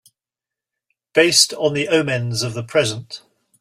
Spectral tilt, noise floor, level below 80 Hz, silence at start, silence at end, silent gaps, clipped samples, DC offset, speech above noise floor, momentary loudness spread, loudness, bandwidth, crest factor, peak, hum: -3 dB/octave; -88 dBFS; -60 dBFS; 1.15 s; 0.45 s; none; under 0.1%; under 0.1%; 70 dB; 16 LU; -17 LUFS; 16 kHz; 20 dB; 0 dBFS; none